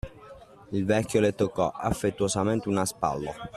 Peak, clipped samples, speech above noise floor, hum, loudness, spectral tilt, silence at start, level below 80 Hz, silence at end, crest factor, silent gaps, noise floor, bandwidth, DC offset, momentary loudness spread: -8 dBFS; under 0.1%; 22 dB; none; -27 LUFS; -5.5 dB/octave; 0.05 s; -50 dBFS; 0 s; 18 dB; none; -49 dBFS; 14 kHz; under 0.1%; 7 LU